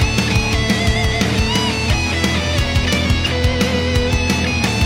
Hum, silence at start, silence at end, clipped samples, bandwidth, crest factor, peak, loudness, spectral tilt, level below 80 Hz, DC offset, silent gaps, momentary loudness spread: none; 0 s; 0 s; under 0.1%; 16.5 kHz; 16 dB; 0 dBFS; -16 LUFS; -4.5 dB/octave; -24 dBFS; under 0.1%; none; 1 LU